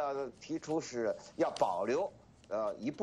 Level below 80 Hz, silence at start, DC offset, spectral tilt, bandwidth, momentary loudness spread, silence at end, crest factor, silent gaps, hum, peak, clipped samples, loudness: -72 dBFS; 0 s; under 0.1%; -5 dB/octave; 11.5 kHz; 9 LU; 0 s; 20 dB; none; none; -16 dBFS; under 0.1%; -36 LUFS